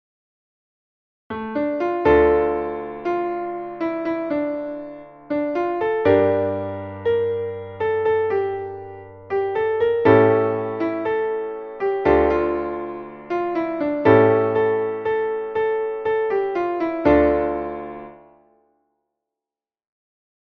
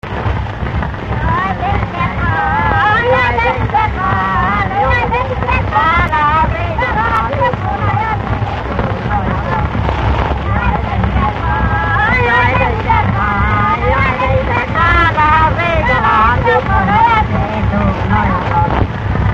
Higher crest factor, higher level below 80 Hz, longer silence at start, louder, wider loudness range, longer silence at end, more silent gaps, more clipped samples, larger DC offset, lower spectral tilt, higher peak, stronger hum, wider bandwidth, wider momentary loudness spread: first, 20 dB vs 12 dB; second, -44 dBFS vs -22 dBFS; first, 1.3 s vs 0.05 s; second, -21 LUFS vs -13 LUFS; about the same, 4 LU vs 4 LU; first, 2.4 s vs 0 s; neither; neither; neither; first, -9 dB/octave vs -7.5 dB/octave; about the same, -2 dBFS vs 0 dBFS; neither; second, 5.6 kHz vs 7.4 kHz; first, 14 LU vs 6 LU